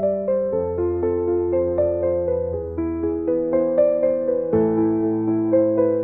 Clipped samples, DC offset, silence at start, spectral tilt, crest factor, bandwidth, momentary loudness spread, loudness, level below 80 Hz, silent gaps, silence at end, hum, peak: under 0.1%; 0.1%; 0 s; -13.5 dB/octave; 14 dB; 2.6 kHz; 5 LU; -21 LUFS; -50 dBFS; none; 0 s; none; -6 dBFS